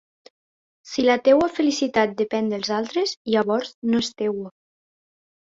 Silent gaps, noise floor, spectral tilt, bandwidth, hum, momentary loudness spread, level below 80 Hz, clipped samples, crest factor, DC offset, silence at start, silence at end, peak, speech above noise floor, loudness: 3.17-3.25 s, 3.74-3.82 s; under -90 dBFS; -4.5 dB/octave; 7.8 kHz; none; 9 LU; -62 dBFS; under 0.1%; 18 dB; under 0.1%; 0.85 s; 1.1 s; -4 dBFS; over 69 dB; -22 LUFS